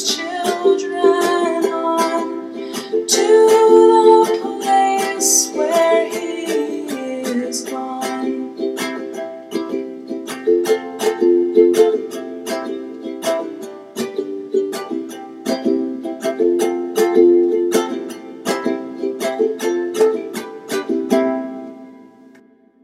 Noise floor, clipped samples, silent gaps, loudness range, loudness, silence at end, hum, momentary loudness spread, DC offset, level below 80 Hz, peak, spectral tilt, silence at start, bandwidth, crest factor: -49 dBFS; under 0.1%; none; 10 LU; -17 LUFS; 0.8 s; none; 15 LU; under 0.1%; -74 dBFS; 0 dBFS; -2.5 dB/octave; 0 s; 15.5 kHz; 18 dB